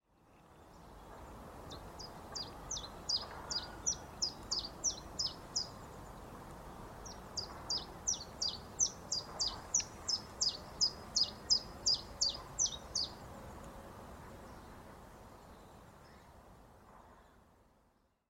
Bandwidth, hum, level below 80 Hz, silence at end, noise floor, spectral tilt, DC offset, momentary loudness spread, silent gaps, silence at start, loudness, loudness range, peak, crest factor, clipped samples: 16 kHz; none; -58 dBFS; 0.7 s; -74 dBFS; -0.5 dB/octave; under 0.1%; 22 LU; none; 0.25 s; -36 LUFS; 20 LU; -18 dBFS; 24 dB; under 0.1%